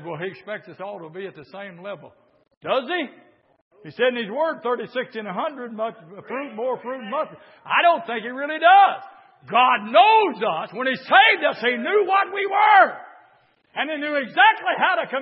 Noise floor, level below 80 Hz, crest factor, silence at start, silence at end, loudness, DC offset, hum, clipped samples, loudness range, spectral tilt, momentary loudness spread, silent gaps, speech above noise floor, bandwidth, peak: -59 dBFS; -82 dBFS; 20 dB; 0 s; 0 s; -20 LUFS; under 0.1%; none; under 0.1%; 11 LU; -8 dB/octave; 20 LU; 2.57-2.61 s, 3.61-3.71 s; 38 dB; 5.8 kHz; -2 dBFS